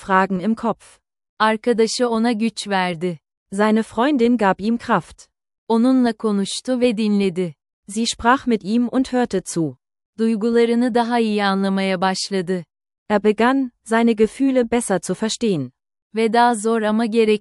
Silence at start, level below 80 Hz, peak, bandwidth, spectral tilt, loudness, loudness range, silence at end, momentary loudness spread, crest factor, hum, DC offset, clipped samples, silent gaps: 0 s; -54 dBFS; -2 dBFS; 12 kHz; -5 dB/octave; -19 LUFS; 1 LU; 0 s; 8 LU; 18 dB; none; under 0.1%; under 0.1%; 1.29-1.37 s, 3.37-3.46 s, 5.58-5.67 s, 7.73-7.83 s, 10.06-10.13 s, 12.98-13.06 s, 16.02-16.10 s